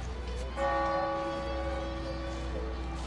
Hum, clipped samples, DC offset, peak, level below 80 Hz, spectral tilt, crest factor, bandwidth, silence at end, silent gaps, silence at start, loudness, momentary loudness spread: none; under 0.1%; under 0.1%; -18 dBFS; -38 dBFS; -6 dB/octave; 14 dB; 11 kHz; 0 s; none; 0 s; -34 LUFS; 8 LU